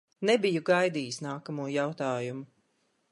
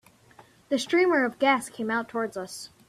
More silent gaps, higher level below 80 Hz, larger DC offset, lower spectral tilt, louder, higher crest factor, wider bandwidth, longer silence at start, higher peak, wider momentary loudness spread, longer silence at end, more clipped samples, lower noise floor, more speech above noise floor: neither; second, -82 dBFS vs -70 dBFS; neither; first, -5 dB/octave vs -3.5 dB/octave; second, -29 LUFS vs -26 LUFS; about the same, 18 dB vs 20 dB; second, 11.5 kHz vs 14 kHz; second, 0.2 s vs 0.7 s; second, -12 dBFS vs -8 dBFS; about the same, 11 LU vs 11 LU; first, 0.65 s vs 0.2 s; neither; first, -74 dBFS vs -55 dBFS; first, 45 dB vs 30 dB